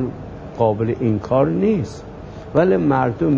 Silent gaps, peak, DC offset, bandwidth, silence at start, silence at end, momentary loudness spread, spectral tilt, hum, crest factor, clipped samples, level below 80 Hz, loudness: none; -2 dBFS; under 0.1%; 8 kHz; 0 s; 0 s; 17 LU; -9 dB/octave; none; 16 dB; under 0.1%; -42 dBFS; -19 LUFS